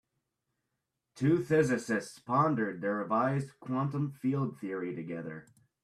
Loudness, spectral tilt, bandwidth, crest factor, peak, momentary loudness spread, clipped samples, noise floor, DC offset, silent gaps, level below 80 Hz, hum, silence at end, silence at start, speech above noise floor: -32 LUFS; -7.5 dB/octave; 12.5 kHz; 18 dB; -14 dBFS; 11 LU; under 0.1%; -85 dBFS; under 0.1%; none; -72 dBFS; none; 0.4 s; 1.15 s; 54 dB